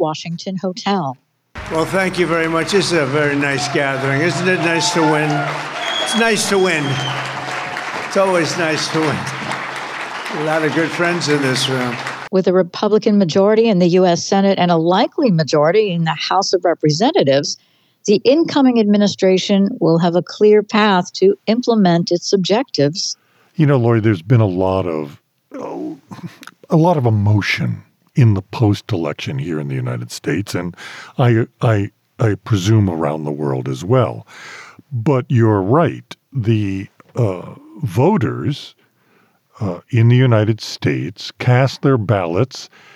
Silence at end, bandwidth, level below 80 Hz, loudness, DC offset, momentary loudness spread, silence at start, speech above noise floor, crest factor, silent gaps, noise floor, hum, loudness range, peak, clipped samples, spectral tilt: 0.3 s; 13.5 kHz; -56 dBFS; -16 LUFS; under 0.1%; 12 LU; 0 s; 41 dB; 14 dB; none; -56 dBFS; none; 5 LU; -4 dBFS; under 0.1%; -5.5 dB/octave